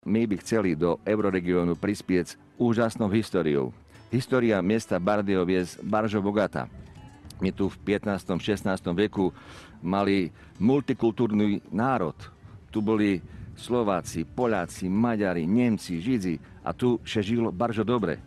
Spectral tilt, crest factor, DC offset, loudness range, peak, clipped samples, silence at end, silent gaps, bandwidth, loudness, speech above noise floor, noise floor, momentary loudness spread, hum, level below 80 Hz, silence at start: -6.5 dB/octave; 16 dB; under 0.1%; 2 LU; -10 dBFS; under 0.1%; 0 s; none; 12.5 kHz; -26 LUFS; 20 dB; -46 dBFS; 9 LU; none; -54 dBFS; 0.05 s